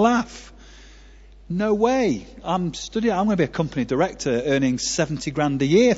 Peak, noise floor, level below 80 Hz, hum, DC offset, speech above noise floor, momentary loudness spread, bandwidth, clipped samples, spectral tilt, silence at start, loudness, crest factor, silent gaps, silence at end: -4 dBFS; -46 dBFS; -46 dBFS; none; under 0.1%; 25 dB; 7 LU; 8 kHz; under 0.1%; -5 dB/octave; 0 s; -22 LUFS; 18 dB; none; 0 s